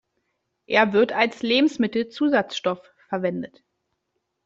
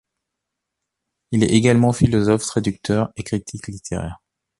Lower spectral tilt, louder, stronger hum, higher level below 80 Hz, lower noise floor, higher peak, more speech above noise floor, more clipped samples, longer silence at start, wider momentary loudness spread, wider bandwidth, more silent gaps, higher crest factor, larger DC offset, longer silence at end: about the same, -5 dB/octave vs -6 dB/octave; second, -22 LUFS vs -19 LUFS; neither; second, -66 dBFS vs -42 dBFS; second, -77 dBFS vs -81 dBFS; about the same, -2 dBFS vs -2 dBFS; second, 55 dB vs 62 dB; neither; second, 0.7 s vs 1.3 s; about the same, 12 LU vs 13 LU; second, 7.8 kHz vs 11.5 kHz; neither; about the same, 22 dB vs 18 dB; neither; first, 1 s vs 0.45 s